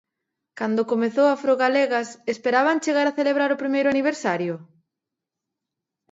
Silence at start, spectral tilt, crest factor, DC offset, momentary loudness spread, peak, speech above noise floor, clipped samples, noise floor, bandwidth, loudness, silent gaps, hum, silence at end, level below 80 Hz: 0.55 s; -5 dB/octave; 16 dB; under 0.1%; 7 LU; -6 dBFS; 64 dB; under 0.1%; -85 dBFS; 8 kHz; -22 LUFS; none; none; 1.5 s; -74 dBFS